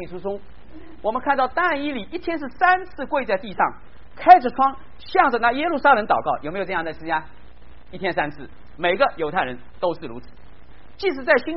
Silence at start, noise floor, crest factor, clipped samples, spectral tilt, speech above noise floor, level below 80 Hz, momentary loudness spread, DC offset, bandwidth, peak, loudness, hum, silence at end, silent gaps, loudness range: 0 s; -47 dBFS; 22 dB; under 0.1%; -2 dB/octave; 26 dB; -48 dBFS; 12 LU; 2%; 5.8 kHz; 0 dBFS; -21 LUFS; none; 0 s; none; 7 LU